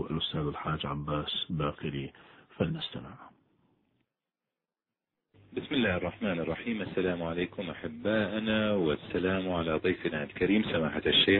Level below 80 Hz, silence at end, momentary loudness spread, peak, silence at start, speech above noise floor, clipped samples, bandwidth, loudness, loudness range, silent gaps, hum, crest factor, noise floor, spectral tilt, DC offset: -54 dBFS; 0 s; 10 LU; -12 dBFS; 0 s; over 59 dB; under 0.1%; 4.5 kHz; -31 LUFS; 11 LU; none; none; 20 dB; under -90 dBFS; -9 dB/octave; under 0.1%